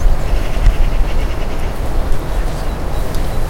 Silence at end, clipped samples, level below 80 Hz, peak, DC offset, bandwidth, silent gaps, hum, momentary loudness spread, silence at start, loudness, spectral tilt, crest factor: 0 s; under 0.1%; -14 dBFS; 0 dBFS; under 0.1%; 16 kHz; none; none; 5 LU; 0 s; -21 LUFS; -6 dB/octave; 12 dB